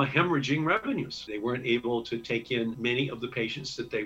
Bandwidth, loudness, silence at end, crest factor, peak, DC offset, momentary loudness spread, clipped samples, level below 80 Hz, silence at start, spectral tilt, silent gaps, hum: 8.4 kHz; -29 LUFS; 0 s; 20 dB; -8 dBFS; under 0.1%; 7 LU; under 0.1%; -62 dBFS; 0 s; -5.5 dB/octave; none; none